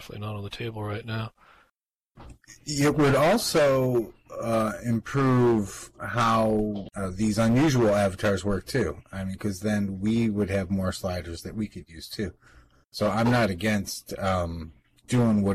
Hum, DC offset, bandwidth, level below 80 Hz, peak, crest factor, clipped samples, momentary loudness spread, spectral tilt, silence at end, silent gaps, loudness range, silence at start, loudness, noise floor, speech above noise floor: none; under 0.1%; 15 kHz; -50 dBFS; -14 dBFS; 10 dB; under 0.1%; 14 LU; -6 dB/octave; 0 s; 1.96-2.00 s, 2.07-2.11 s; 5 LU; 0 s; -26 LUFS; -76 dBFS; 51 dB